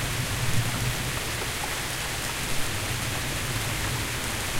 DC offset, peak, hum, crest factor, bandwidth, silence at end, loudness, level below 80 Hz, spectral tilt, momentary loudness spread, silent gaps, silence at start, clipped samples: under 0.1%; -12 dBFS; none; 16 dB; 16 kHz; 0 s; -28 LUFS; -38 dBFS; -3 dB/octave; 2 LU; none; 0 s; under 0.1%